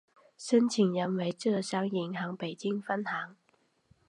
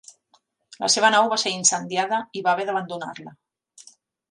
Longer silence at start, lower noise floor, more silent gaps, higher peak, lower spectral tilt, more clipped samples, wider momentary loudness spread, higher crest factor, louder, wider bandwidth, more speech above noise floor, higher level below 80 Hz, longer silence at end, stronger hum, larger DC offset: second, 0.4 s vs 0.8 s; first, -71 dBFS vs -64 dBFS; neither; second, -14 dBFS vs -4 dBFS; first, -5.5 dB/octave vs -1 dB/octave; neither; second, 10 LU vs 16 LU; about the same, 18 dB vs 20 dB; second, -31 LUFS vs -21 LUFS; about the same, 11 kHz vs 11.5 kHz; about the same, 41 dB vs 42 dB; about the same, -80 dBFS vs -76 dBFS; first, 0.75 s vs 0.5 s; neither; neither